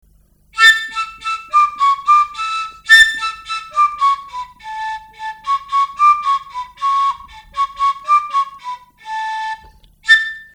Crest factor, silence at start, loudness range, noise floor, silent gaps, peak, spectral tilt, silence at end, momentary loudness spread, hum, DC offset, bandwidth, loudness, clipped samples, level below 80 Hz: 16 dB; 0.55 s; 7 LU; -52 dBFS; none; 0 dBFS; 2.5 dB/octave; 0.1 s; 20 LU; 50 Hz at -60 dBFS; under 0.1%; over 20 kHz; -14 LUFS; under 0.1%; -50 dBFS